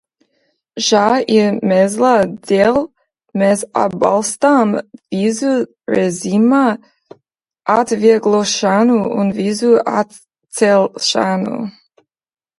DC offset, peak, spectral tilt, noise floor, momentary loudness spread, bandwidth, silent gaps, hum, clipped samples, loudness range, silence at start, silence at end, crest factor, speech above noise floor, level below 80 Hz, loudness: under 0.1%; 0 dBFS; -4.5 dB/octave; -67 dBFS; 10 LU; 11.5 kHz; none; none; under 0.1%; 2 LU; 0.75 s; 0.9 s; 16 dB; 53 dB; -58 dBFS; -14 LUFS